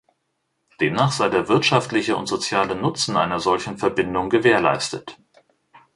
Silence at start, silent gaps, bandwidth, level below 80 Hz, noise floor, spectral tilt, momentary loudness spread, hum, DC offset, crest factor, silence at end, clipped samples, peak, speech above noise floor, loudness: 0.8 s; none; 11.5 kHz; -54 dBFS; -73 dBFS; -4.5 dB/octave; 7 LU; none; under 0.1%; 20 dB; 0.2 s; under 0.1%; -2 dBFS; 53 dB; -20 LUFS